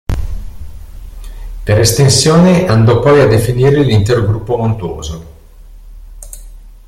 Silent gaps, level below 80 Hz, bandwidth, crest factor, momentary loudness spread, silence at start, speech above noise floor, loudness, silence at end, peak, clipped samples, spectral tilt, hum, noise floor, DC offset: none; -28 dBFS; 15.5 kHz; 12 dB; 23 LU; 0.1 s; 26 dB; -10 LUFS; 0.15 s; 0 dBFS; under 0.1%; -5.5 dB/octave; none; -35 dBFS; under 0.1%